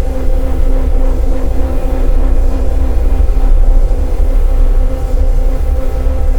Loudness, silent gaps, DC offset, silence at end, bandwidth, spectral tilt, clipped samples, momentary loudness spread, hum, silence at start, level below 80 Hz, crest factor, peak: -16 LUFS; none; 3%; 0 s; 4.4 kHz; -8 dB/octave; 0.4%; 3 LU; none; 0 s; -10 dBFS; 8 dB; 0 dBFS